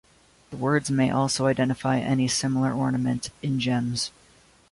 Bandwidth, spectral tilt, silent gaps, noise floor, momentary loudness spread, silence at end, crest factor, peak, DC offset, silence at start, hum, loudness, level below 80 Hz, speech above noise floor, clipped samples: 11.5 kHz; -5 dB/octave; none; -57 dBFS; 7 LU; 0.6 s; 16 dB; -10 dBFS; under 0.1%; 0.5 s; none; -25 LUFS; -56 dBFS; 33 dB; under 0.1%